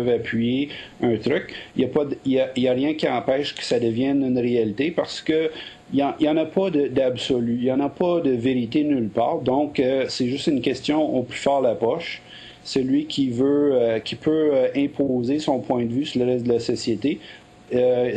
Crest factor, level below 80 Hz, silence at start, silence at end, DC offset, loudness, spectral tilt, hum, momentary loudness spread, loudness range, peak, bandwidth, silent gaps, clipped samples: 14 dB; -56 dBFS; 0 s; 0 s; under 0.1%; -22 LUFS; -6 dB/octave; none; 5 LU; 2 LU; -8 dBFS; 9.4 kHz; none; under 0.1%